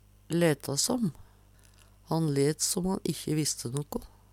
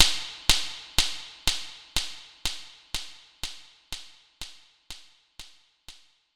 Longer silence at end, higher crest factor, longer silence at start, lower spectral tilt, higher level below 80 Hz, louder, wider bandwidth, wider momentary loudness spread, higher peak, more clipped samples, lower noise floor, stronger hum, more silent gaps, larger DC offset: second, 0.25 s vs 0.45 s; second, 18 dB vs 30 dB; first, 0.3 s vs 0 s; first, -4.5 dB/octave vs 0 dB/octave; second, -56 dBFS vs -42 dBFS; about the same, -29 LUFS vs -29 LUFS; about the same, 17.5 kHz vs 18.5 kHz; second, 8 LU vs 24 LU; second, -12 dBFS vs 0 dBFS; neither; first, -58 dBFS vs -52 dBFS; first, 50 Hz at -60 dBFS vs none; neither; second, under 0.1% vs 0.1%